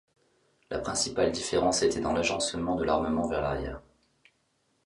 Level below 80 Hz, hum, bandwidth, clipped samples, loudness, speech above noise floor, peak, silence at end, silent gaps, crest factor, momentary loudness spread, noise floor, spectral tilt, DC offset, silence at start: -48 dBFS; none; 11.5 kHz; under 0.1%; -28 LUFS; 44 dB; -12 dBFS; 1.05 s; none; 18 dB; 9 LU; -73 dBFS; -3.5 dB/octave; under 0.1%; 0.7 s